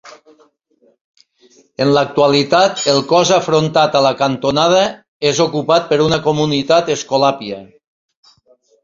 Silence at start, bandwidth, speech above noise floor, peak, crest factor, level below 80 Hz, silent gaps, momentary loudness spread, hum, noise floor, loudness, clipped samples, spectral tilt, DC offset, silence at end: 0.05 s; 7.8 kHz; 43 dB; 0 dBFS; 14 dB; -52 dBFS; 1.01-1.14 s, 5.08-5.20 s; 6 LU; none; -57 dBFS; -14 LUFS; under 0.1%; -4.5 dB/octave; under 0.1%; 1.2 s